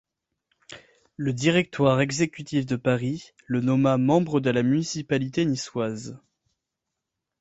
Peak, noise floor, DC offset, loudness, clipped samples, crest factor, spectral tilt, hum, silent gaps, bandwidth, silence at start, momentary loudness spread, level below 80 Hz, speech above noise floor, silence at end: -6 dBFS; -84 dBFS; under 0.1%; -24 LUFS; under 0.1%; 20 dB; -6 dB/octave; none; none; 8.2 kHz; 0.7 s; 9 LU; -60 dBFS; 60 dB; 1.25 s